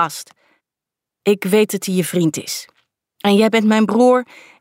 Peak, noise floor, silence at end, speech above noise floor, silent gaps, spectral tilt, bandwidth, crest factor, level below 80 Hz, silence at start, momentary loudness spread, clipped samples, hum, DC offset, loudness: -2 dBFS; -86 dBFS; 0.35 s; 70 dB; none; -5 dB/octave; 16.5 kHz; 14 dB; -68 dBFS; 0 s; 13 LU; under 0.1%; none; under 0.1%; -16 LUFS